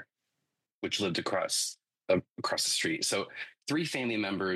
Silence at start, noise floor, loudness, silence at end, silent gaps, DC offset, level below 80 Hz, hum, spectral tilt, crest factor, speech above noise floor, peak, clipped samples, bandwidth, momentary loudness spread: 0 s; -85 dBFS; -31 LUFS; 0 s; 0.74-0.82 s, 2.31-2.36 s; under 0.1%; -74 dBFS; none; -2.5 dB/octave; 18 dB; 54 dB; -14 dBFS; under 0.1%; 12.5 kHz; 9 LU